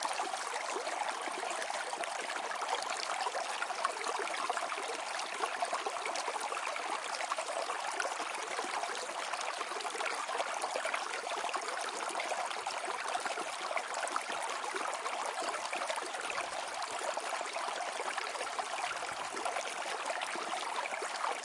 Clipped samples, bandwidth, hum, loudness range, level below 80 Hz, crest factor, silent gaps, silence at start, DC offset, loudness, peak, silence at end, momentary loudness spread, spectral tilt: under 0.1%; 11.5 kHz; none; 1 LU; -86 dBFS; 22 dB; none; 0 s; under 0.1%; -37 LUFS; -16 dBFS; 0 s; 2 LU; 0.5 dB/octave